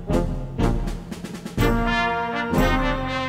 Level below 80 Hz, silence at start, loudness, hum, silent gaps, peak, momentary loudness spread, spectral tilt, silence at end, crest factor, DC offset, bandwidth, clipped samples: -28 dBFS; 0 s; -23 LUFS; none; none; -6 dBFS; 11 LU; -6 dB/octave; 0 s; 16 dB; under 0.1%; 16 kHz; under 0.1%